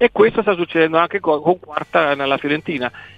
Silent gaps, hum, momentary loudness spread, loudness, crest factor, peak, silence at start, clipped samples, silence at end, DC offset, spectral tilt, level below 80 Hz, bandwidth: none; none; 6 LU; -17 LUFS; 16 dB; 0 dBFS; 0 s; under 0.1%; 0.1 s; under 0.1%; -7 dB/octave; -54 dBFS; 5.4 kHz